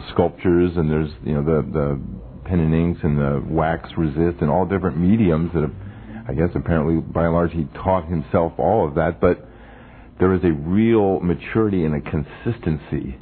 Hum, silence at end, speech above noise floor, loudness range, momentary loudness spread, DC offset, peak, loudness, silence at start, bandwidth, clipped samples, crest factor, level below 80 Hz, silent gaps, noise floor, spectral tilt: none; 0 s; 23 dB; 1 LU; 8 LU; under 0.1%; -2 dBFS; -20 LUFS; 0 s; 4.5 kHz; under 0.1%; 18 dB; -36 dBFS; none; -42 dBFS; -12.5 dB/octave